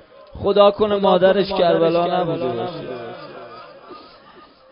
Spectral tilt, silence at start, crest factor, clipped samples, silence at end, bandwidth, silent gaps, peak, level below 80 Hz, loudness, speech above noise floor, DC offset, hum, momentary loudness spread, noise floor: -11 dB/octave; 0.35 s; 20 dB; under 0.1%; 0.7 s; 5.4 kHz; none; 0 dBFS; -50 dBFS; -17 LUFS; 30 dB; under 0.1%; none; 22 LU; -47 dBFS